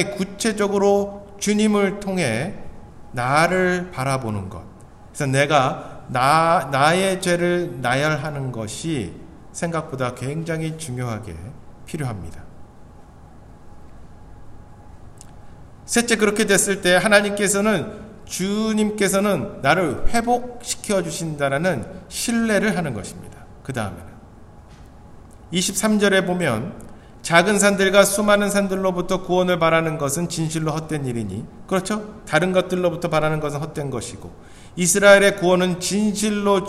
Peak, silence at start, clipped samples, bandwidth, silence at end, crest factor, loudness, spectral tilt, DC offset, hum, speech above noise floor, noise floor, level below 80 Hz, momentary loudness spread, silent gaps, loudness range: 0 dBFS; 0 s; under 0.1%; 15.5 kHz; 0 s; 20 dB; -20 LUFS; -4 dB/octave; under 0.1%; none; 23 dB; -43 dBFS; -44 dBFS; 15 LU; none; 10 LU